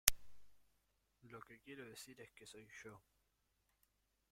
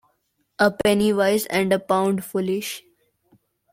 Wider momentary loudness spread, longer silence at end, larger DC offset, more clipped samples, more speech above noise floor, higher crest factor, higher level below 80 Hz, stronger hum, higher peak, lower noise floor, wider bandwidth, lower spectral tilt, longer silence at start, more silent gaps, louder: about the same, 6 LU vs 8 LU; first, 1.35 s vs 0.95 s; neither; neither; second, 25 dB vs 49 dB; first, 44 dB vs 20 dB; second, -62 dBFS vs -56 dBFS; neither; about the same, -4 dBFS vs -4 dBFS; first, -83 dBFS vs -70 dBFS; about the same, 16.5 kHz vs 16.5 kHz; second, 0 dB/octave vs -5 dB/octave; second, 0.05 s vs 0.6 s; neither; second, -47 LUFS vs -21 LUFS